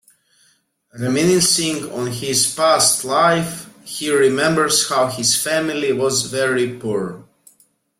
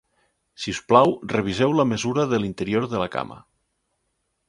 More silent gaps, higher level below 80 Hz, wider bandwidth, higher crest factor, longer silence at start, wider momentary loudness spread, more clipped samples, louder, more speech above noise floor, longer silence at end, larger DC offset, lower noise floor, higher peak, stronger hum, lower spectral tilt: neither; about the same, -58 dBFS vs -54 dBFS; first, 16.5 kHz vs 11.5 kHz; second, 16 dB vs 22 dB; first, 0.95 s vs 0.6 s; about the same, 11 LU vs 13 LU; neither; first, -17 LUFS vs -22 LUFS; second, 43 dB vs 53 dB; second, 0.75 s vs 1.1 s; neither; second, -60 dBFS vs -74 dBFS; about the same, -2 dBFS vs 0 dBFS; neither; second, -3 dB/octave vs -5.5 dB/octave